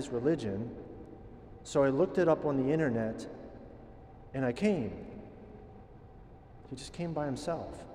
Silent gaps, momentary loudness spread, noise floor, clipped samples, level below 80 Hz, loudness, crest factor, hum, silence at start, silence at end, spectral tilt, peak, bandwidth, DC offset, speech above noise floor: none; 24 LU; -53 dBFS; under 0.1%; -56 dBFS; -32 LUFS; 20 dB; none; 0 s; 0 s; -7 dB/octave; -14 dBFS; 11.5 kHz; under 0.1%; 21 dB